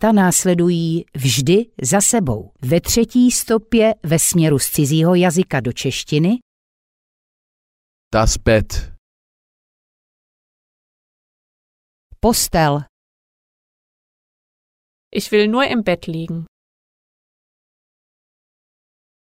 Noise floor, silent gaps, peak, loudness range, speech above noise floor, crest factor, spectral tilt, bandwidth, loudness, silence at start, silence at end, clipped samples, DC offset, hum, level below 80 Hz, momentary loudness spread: under -90 dBFS; 6.42-8.11 s, 8.98-12.10 s, 12.89-15.11 s; -4 dBFS; 9 LU; over 74 dB; 16 dB; -4.5 dB/octave; 16 kHz; -16 LUFS; 0 s; 2.9 s; under 0.1%; under 0.1%; none; -36 dBFS; 10 LU